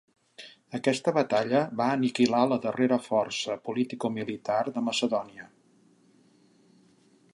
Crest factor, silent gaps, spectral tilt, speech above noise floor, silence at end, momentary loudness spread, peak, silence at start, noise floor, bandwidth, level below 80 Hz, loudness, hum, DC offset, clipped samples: 20 dB; none; -5 dB/octave; 35 dB; 1.9 s; 13 LU; -10 dBFS; 0.4 s; -62 dBFS; 11.5 kHz; -76 dBFS; -27 LUFS; none; under 0.1%; under 0.1%